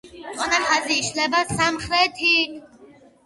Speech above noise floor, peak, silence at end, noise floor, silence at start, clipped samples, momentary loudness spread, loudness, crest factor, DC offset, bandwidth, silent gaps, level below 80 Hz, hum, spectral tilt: 28 dB; -4 dBFS; 0.4 s; -50 dBFS; 0.05 s; under 0.1%; 7 LU; -20 LUFS; 18 dB; under 0.1%; 11.5 kHz; none; -52 dBFS; none; -2 dB/octave